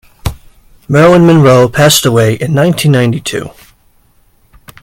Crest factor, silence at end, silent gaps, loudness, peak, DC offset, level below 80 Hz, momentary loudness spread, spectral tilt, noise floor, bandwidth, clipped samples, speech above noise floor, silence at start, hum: 10 dB; 1.3 s; none; -8 LUFS; 0 dBFS; under 0.1%; -36 dBFS; 17 LU; -5.5 dB/octave; -49 dBFS; 17 kHz; 0.8%; 41 dB; 0.25 s; none